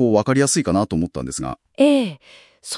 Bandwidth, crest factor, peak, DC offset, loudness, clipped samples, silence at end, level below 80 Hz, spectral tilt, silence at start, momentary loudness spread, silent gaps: 12 kHz; 16 dB; -4 dBFS; under 0.1%; -19 LUFS; under 0.1%; 0 s; -48 dBFS; -5 dB/octave; 0 s; 12 LU; none